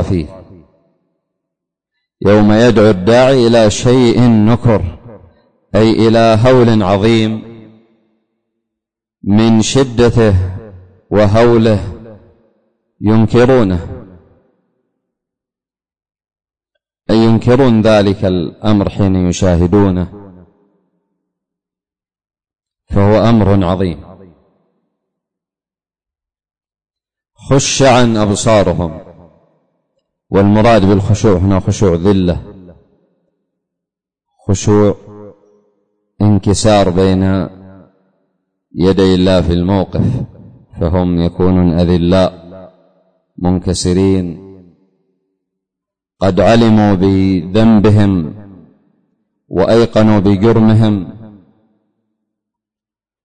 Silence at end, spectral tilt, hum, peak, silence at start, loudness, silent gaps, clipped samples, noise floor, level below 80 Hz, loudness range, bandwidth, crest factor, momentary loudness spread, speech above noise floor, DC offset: 1.95 s; -6.5 dB/octave; none; -2 dBFS; 0 s; -11 LUFS; none; under 0.1%; under -90 dBFS; -32 dBFS; 7 LU; 9.6 kHz; 12 dB; 11 LU; over 80 dB; under 0.1%